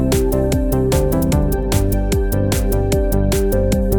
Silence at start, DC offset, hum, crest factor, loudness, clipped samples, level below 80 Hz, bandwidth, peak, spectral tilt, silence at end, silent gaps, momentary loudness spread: 0 s; under 0.1%; none; 12 dB; -17 LUFS; under 0.1%; -20 dBFS; 19.5 kHz; -2 dBFS; -6.5 dB/octave; 0 s; none; 2 LU